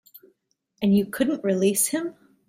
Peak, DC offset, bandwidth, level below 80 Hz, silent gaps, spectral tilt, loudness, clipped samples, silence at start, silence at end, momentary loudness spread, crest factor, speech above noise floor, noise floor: -8 dBFS; under 0.1%; 16 kHz; -62 dBFS; none; -4.5 dB/octave; -23 LUFS; under 0.1%; 0.8 s; 0.35 s; 8 LU; 16 dB; 49 dB; -71 dBFS